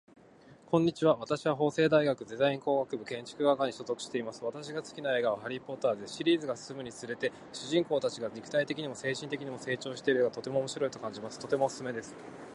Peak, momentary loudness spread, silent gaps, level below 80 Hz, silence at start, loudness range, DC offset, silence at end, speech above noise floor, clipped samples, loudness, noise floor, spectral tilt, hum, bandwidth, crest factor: -12 dBFS; 12 LU; none; -74 dBFS; 0.45 s; 4 LU; under 0.1%; 0 s; 25 dB; under 0.1%; -32 LUFS; -57 dBFS; -5 dB/octave; none; 11.5 kHz; 20 dB